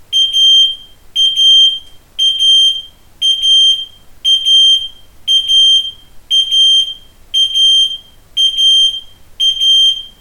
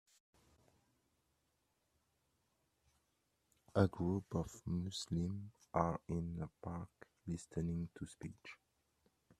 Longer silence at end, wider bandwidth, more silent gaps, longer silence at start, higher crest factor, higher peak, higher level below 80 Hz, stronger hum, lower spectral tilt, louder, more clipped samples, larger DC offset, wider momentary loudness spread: second, 0.1 s vs 0.85 s; first, 17 kHz vs 13 kHz; neither; second, 0.1 s vs 3.75 s; second, 10 dB vs 28 dB; first, -2 dBFS vs -16 dBFS; first, -46 dBFS vs -66 dBFS; neither; second, 3 dB/octave vs -7 dB/octave; first, -8 LUFS vs -42 LUFS; neither; neither; about the same, 15 LU vs 16 LU